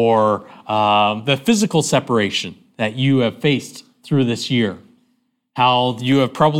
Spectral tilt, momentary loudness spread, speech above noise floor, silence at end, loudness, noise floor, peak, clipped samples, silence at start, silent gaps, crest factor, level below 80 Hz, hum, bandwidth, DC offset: -5 dB/octave; 9 LU; 49 dB; 0 s; -18 LUFS; -66 dBFS; -2 dBFS; under 0.1%; 0 s; none; 16 dB; -58 dBFS; none; 16 kHz; under 0.1%